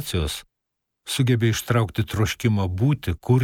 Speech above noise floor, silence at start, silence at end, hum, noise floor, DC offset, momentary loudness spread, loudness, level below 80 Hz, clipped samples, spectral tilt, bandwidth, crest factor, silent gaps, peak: 58 dB; 0 s; 0 s; none; -80 dBFS; under 0.1%; 9 LU; -23 LUFS; -42 dBFS; under 0.1%; -5.5 dB/octave; 17 kHz; 16 dB; none; -6 dBFS